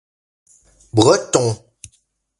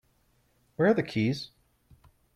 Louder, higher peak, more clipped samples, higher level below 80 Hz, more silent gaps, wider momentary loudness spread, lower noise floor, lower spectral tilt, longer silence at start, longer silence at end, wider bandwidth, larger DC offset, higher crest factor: first, -16 LUFS vs -28 LUFS; first, 0 dBFS vs -12 dBFS; neither; first, -52 dBFS vs -64 dBFS; neither; second, 10 LU vs 20 LU; second, -63 dBFS vs -68 dBFS; second, -4.5 dB/octave vs -7 dB/octave; first, 0.95 s vs 0.8 s; about the same, 0.85 s vs 0.9 s; second, 11.5 kHz vs 13 kHz; neither; about the same, 20 dB vs 20 dB